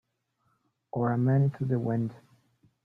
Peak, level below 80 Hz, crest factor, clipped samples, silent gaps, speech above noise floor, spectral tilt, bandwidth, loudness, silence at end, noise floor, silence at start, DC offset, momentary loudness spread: -16 dBFS; -66 dBFS; 14 dB; under 0.1%; none; 48 dB; -11.5 dB/octave; 2.6 kHz; -28 LUFS; 0.7 s; -75 dBFS; 0.95 s; under 0.1%; 10 LU